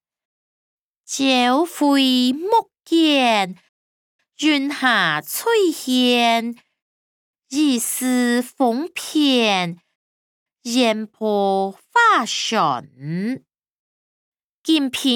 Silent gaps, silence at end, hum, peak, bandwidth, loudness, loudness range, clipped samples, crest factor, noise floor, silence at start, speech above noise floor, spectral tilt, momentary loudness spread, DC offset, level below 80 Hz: 3.69-4.19 s, 6.82-7.34 s, 9.95-10.46 s, 13.70-14.32 s, 14.44-14.64 s; 0 s; none; -4 dBFS; 19 kHz; -18 LUFS; 3 LU; under 0.1%; 16 dB; under -90 dBFS; 1.1 s; over 72 dB; -3 dB/octave; 11 LU; under 0.1%; -76 dBFS